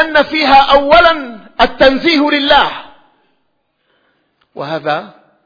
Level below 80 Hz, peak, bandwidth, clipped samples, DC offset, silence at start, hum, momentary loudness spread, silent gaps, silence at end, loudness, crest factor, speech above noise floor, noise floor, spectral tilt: -36 dBFS; 0 dBFS; 5.4 kHz; 0.3%; under 0.1%; 0 s; none; 14 LU; none; 0.4 s; -10 LUFS; 12 dB; 54 dB; -64 dBFS; -5 dB/octave